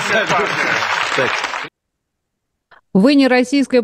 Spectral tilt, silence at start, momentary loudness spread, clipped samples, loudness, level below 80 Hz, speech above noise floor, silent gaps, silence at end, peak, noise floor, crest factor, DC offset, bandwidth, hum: -4.5 dB/octave; 0 s; 10 LU; under 0.1%; -15 LUFS; -60 dBFS; 61 dB; none; 0 s; 0 dBFS; -75 dBFS; 16 dB; under 0.1%; 15.5 kHz; none